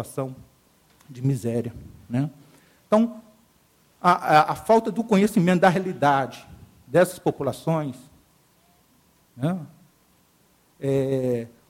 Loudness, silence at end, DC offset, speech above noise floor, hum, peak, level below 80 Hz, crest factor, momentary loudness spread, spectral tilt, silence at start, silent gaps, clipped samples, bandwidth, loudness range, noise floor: -23 LUFS; 0.2 s; under 0.1%; 39 dB; none; -4 dBFS; -60 dBFS; 22 dB; 14 LU; -6.5 dB/octave; 0 s; none; under 0.1%; 16.5 kHz; 10 LU; -61 dBFS